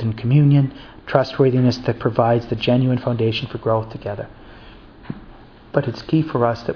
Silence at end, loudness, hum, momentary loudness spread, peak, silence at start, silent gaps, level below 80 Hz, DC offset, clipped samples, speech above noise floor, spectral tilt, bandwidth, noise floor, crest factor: 0 s; -19 LUFS; none; 17 LU; 0 dBFS; 0 s; none; -46 dBFS; under 0.1%; under 0.1%; 24 dB; -8.5 dB/octave; 5.4 kHz; -43 dBFS; 20 dB